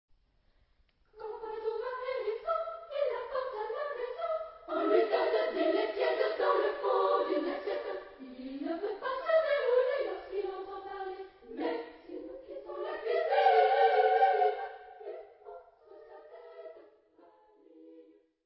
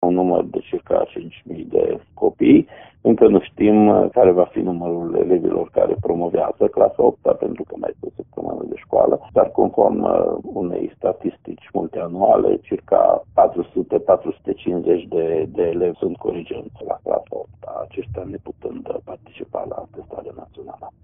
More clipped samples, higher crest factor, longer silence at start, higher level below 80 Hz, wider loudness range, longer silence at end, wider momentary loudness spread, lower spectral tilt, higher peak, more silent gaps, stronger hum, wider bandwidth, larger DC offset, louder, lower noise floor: neither; about the same, 20 dB vs 18 dB; first, 1.15 s vs 0 s; second, -72 dBFS vs -50 dBFS; second, 9 LU vs 12 LU; first, 0.45 s vs 0.15 s; first, 21 LU vs 18 LU; second, 0 dB/octave vs -5.5 dB/octave; second, -14 dBFS vs 0 dBFS; neither; neither; first, 5.6 kHz vs 3.7 kHz; neither; second, -31 LUFS vs -19 LUFS; first, -69 dBFS vs -38 dBFS